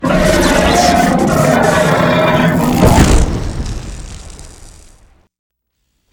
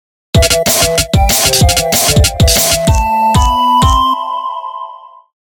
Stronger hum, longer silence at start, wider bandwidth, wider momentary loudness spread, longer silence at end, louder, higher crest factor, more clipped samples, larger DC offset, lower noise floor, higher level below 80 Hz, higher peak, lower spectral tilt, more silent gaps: neither; second, 0 s vs 0.35 s; about the same, over 20 kHz vs over 20 kHz; first, 17 LU vs 11 LU; first, 1.4 s vs 0.45 s; about the same, -11 LUFS vs -10 LUFS; about the same, 12 dB vs 12 dB; first, 0.1% vs under 0.1%; neither; first, -66 dBFS vs -31 dBFS; about the same, -20 dBFS vs -18 dBFS; about the same, 0 dBFS vs 0 dBFS; first, -5 dB/octave vs -3.5 dB/octave; neither